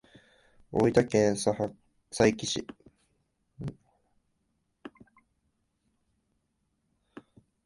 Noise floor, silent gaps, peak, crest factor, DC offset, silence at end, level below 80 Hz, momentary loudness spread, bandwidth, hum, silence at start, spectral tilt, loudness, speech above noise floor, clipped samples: -77 dBFS; none; -6 dBFS; 26 dB; under 0.1%; 2.8 s; -60 dBFS; 26 LU; 11.5 kHz; none; 0.7 s; -5 dB/octave; -27 LUFS; 51 dB; under 0.1%